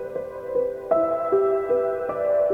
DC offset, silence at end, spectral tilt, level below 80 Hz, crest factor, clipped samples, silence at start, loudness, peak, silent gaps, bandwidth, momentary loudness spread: under 0.1%; 0 s; -8 dB/octave; -58 dBFS; 14 dB; under 0.1%; 0 s; -24 LUFS; -8 dBFS; none; 3.7 kHz; 6 LU